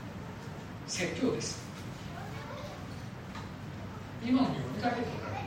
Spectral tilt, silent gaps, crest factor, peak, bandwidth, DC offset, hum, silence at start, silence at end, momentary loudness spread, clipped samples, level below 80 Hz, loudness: -5 dB/octave; none; 20 dB; -16 dBFS; 16 kHz; under 0.1%; none; 0 s; 0 s; 13 LU; under 0.1%; -58 dBFS; -36 LUFS